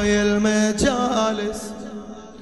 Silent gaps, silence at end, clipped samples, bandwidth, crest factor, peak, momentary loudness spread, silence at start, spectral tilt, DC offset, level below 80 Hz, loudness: none; 0 s; under 0.1%; 12 kHz; 16 dB; -6 dBFS; 16 LU; 0 s; -4.5 dB/octave; 0.3%; -42 dBFS; -20 LUFS